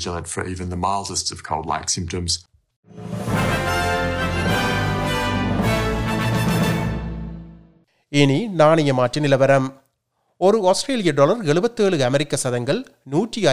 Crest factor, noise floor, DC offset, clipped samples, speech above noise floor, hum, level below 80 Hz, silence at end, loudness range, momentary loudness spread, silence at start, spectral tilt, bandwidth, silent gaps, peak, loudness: 18 dB; -70 dBFS; under 0.1%; under 0.1%; 51 dB; none; -38 dBFS; 0 s; 5 LU; 10 LU; 0 s; -5 dB/octave; 16 kHz; 2.76-2.83 s; -2 dBFS; -20 LUFS